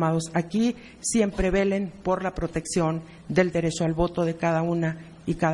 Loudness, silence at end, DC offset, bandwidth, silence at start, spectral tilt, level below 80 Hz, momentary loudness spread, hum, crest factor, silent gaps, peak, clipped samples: -26 LUFS; 0 s; under 0.1%; 11.5 kHz; 0 s; -5.5 dB/octave; -42 dBFS; 7 LU; none; 18 dB; none; -6 dBFS; under 0.1%